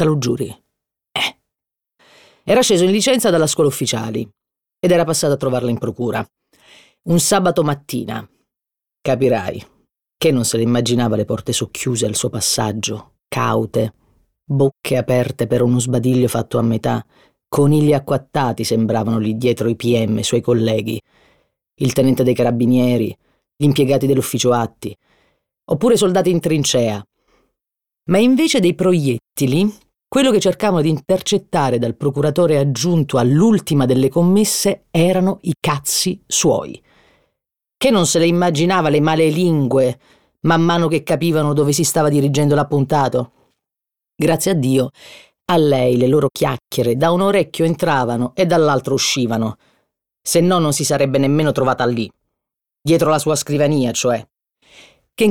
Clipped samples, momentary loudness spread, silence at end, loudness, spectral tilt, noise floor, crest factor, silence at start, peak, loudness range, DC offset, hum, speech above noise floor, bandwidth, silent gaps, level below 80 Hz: under 0.1%; 9 LU; 0 s; -16 LUFS; -5 dB/octave; -86 dBFS; 14 dB; 0 s; -2 dBFS; 4 LU; under 0.1%; none; 70 dB; 19 kHz; none; -52 dBFS